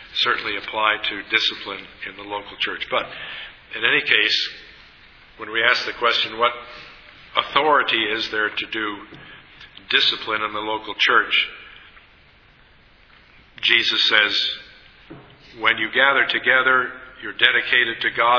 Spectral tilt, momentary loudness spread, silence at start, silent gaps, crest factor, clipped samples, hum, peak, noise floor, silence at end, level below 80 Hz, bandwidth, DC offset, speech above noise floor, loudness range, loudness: -2.5 dB/octave; 17 LU; 0 s; none; 22 dB; under 0.1%; none; 0 dBFS; -52 dBFS; 0 s; -58 dBFS; 5.4 kHz; under 0.1%; 31 dB; 4 LU; -19 LUFS